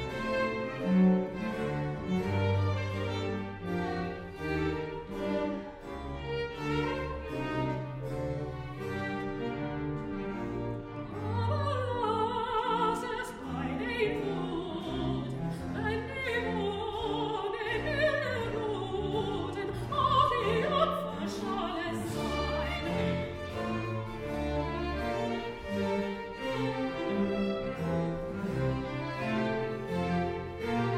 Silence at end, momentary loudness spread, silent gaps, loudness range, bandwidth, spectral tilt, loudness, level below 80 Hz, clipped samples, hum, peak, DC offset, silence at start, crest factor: 0 s; 8 LU; none; 5 LU; 15 kHz; -7 dB/octave; -33 LUFS; -48 dBFS; under 0.1%; none; -14 dBFS; under 0.1%; 0 s; 18 dB